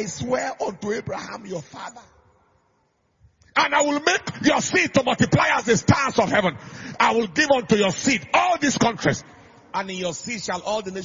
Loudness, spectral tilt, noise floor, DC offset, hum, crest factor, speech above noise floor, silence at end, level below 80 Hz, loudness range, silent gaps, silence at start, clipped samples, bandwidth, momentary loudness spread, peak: -21 LUFS; -4 dB/octave; -67 dBFS; under 0.1%; none; 20 dB; 45 dB; 0 s; -54 dBFS; 8 LU; none; 0 s; under 0.1%; 7.6 kHz; 13 LU; -2 dBFS